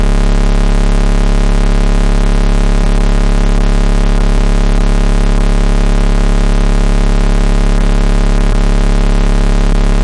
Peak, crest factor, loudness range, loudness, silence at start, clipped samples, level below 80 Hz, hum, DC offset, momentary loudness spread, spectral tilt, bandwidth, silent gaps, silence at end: -2 dBFS; 6 dB; 0 LU; -14 LUFS; 0 s; under 0.1%; -8 dBFS; none; under 0.1%; 0 LU; -6 dB/octave; 10.5 kHz; none; 0 s